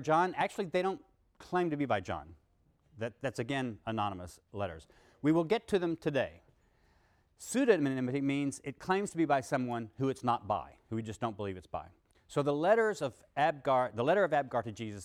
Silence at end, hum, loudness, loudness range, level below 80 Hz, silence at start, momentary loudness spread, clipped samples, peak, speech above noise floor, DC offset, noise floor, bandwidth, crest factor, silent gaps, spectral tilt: 0 s; none; -33 LUFS; 5 LU; -66 dBFS; 0 s; 13 LU; under 0.1%; -12 dBFS; 38 dB; under 0.1%; -70 dBFS; 15.5 kHz; 20 dB; none; -6 dB/octave